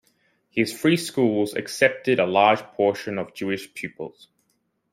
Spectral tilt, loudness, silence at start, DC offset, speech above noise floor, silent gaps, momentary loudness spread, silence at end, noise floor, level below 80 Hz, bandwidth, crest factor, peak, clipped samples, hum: -5 dB/octave; -22 LUFS; 0.55 s; under 0.1%; 49 dB; none; 15 LU; 0.85 s; -71 dBFS; -68 dBFS; 16 kHz; 22 dB; -2 dBFS; under 0.1%; none